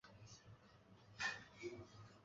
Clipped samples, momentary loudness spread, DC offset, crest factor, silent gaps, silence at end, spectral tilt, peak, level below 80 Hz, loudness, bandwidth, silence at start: under 0.1%; 21 LU; under 0.1%; 22 dB; none; 0 s; -2 dB/octave; -32 dBFS; -76 dBFS; -50 LUFS; 7.6 kHz; 0.05 s